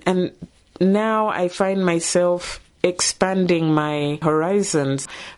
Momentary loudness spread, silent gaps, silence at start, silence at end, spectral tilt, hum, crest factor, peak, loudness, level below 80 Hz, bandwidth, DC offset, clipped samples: 5 LU; none; 0.05 s; 0.05 s; -4.5 dB/octave; none; 18 dB; -4 dBFS; -20 LUFS; -52 dBFS; 11.5 kHz; under 0.1%; under 0.1%